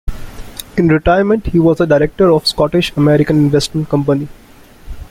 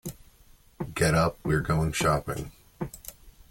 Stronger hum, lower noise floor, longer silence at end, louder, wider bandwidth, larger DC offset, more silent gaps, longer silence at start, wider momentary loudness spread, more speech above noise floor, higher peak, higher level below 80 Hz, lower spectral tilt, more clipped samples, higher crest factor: neither; second, -37 dBFS vs -57 dBFS; about the same, 0.05 s vs 0.1 s; first, -13 LUFS vs -27 LUFS; about the same, 16 kHz vs 17 kHz; neither; neither; about the same, 0.05 s vs 0.05 s; about the same, 17 LU vs 19 LU; second, 25 dB vs 31 dB; first, 0 dBFS vs -10 dBFS; first, -30 dBFS vs -44 dBFS; about the same, -6.5 dB/octave vs -5.5 dB/octave; neither; about the same, 14 dB vs 18 dB